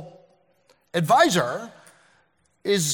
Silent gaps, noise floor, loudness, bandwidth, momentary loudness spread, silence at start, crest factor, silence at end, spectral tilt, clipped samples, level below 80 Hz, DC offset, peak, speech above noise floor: none; -65 dBFS; -22 LUFS; 18 kHz; 16 LU; 0 s; 20 dB; 0 s; -3.5 dB/octave; under 0.1%; -70 dBFS; under 0.1%; -4 dBFS; 45 dB